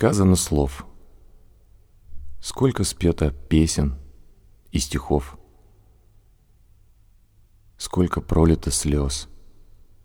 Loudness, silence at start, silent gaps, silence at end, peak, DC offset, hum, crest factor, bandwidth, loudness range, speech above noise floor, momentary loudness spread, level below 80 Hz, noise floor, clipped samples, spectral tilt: -22 LUFS; 0 s; none; 0.7 s; -4 dBFS; under 0.1%; none; 22 dB; 17.5 kHz; 7 LU; 35 dB; 16 LU; -34 dBFS; -55 dBFS; under 0.1%; -5.5 dB/octave